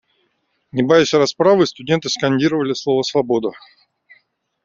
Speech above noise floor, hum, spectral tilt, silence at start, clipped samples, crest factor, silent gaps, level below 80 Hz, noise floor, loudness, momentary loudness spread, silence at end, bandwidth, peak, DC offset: 51 dB; none; -5 dB/octave; 0.75 s; under 0.1%; 16 dB; none; -58 dBFS; -67 dBFS; -17 LUFS; 7 LU; 1.1 s; 7.6 kHz; -2 dBFS; under 0.1%